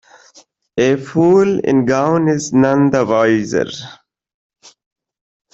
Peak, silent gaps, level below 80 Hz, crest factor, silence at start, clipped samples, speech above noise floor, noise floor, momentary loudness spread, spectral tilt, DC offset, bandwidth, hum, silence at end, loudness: -2 dBFS; none; -54 dBFS; 14 dB; 0.75 s; under 0.1%; 35 dB; -49 dBFS; 10 LU; -6 dB/octave; under 0.1%; 8 kHz; none; 1.6 s; -14 LUFS